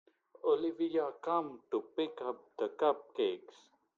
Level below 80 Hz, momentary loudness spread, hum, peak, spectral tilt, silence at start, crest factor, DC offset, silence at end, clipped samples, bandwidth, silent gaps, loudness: -86 dBFS; 7 LU; none; -16 dBFS; -6 dB/octave; 0.45 s; 20 dB; under 0.1%; 0.6 s; under 0.1%; 7.2 kHz; none; -36 LUFS